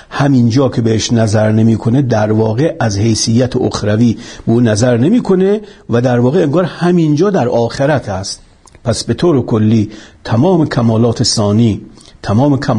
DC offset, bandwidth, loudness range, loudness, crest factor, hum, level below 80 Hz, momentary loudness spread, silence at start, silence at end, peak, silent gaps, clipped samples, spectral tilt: under 0.1%; 11 kHz; 2 LU; -12 LUFS; 10 dB; none; -42 dBFS; 7 LU; 0.1 s; 0 s; -2 dBFS; none; under 0.1%; -6 dB/octave